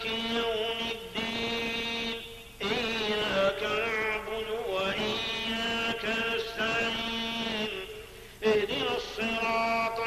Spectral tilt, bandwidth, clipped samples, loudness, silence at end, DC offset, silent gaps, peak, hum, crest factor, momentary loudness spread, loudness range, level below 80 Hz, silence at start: -3.5 dB/octave; 15 kHz; under 0.1%; -30 LUFS; 0 s; under 0.1%; none; -16 dBFS; none; 16 dB; 6 LU; 1 LU; -54 dBFS; 0 s